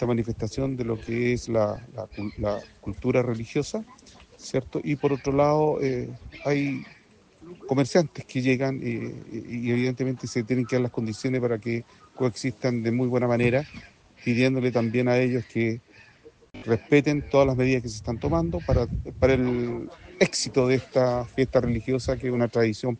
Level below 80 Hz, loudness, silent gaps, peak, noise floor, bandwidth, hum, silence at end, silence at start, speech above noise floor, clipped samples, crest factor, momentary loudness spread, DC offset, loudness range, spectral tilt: -46 dBFS; -26 LUFS; none; -6 dBFS; -54 dBFS; 9.6 kHz; none; 0 s; 0 s; 29 dB; under 0.1%; 20 dB; 12 LU; under 0.1%; 4 LU; -6.5 dB/octave